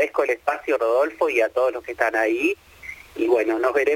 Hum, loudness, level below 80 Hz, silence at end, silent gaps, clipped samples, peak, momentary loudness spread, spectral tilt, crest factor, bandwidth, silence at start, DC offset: none; -22 LUFS; -58 dBFS; 0 s; none; under 0.1%; -4 dBFS; 9 LU; -4 dB/octave; 18 dB; 17 kHz; 0 s; under 0.1%